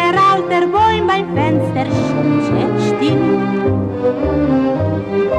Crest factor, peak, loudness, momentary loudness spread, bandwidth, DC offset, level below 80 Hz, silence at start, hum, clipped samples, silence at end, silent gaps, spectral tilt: 10 dB; -4 dBFS; -15 LUFS; 5 LU; 10.5 kHz; under 0.1%; -38 dBFS; 0 s; none; under 0.1%; 0 s; none; -7.5 dB/octave